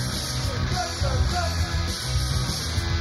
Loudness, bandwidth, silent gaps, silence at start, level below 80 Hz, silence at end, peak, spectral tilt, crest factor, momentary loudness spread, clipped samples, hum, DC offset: -25 LUFS; 15 kHz; none; 0 s; -30 dBFS; 0 s; -12 dBFS; -4 dB/octave; 14 dB; 2 LU; under 0.1%; none; under 0.1%